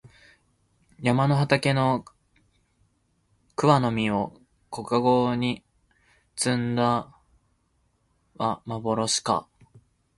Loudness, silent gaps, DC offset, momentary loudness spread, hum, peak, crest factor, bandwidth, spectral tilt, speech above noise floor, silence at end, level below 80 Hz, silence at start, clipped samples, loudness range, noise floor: -25 LUFS; none; under 0.1%; 10 LU; none; -4 dBFS; 22 dB; 11.5 kHz; -5 dB/octave; 46 dB; 0.75 s; -60 dBFS; 0.05 s; under 0.1%; 4 LU; -69 dBFS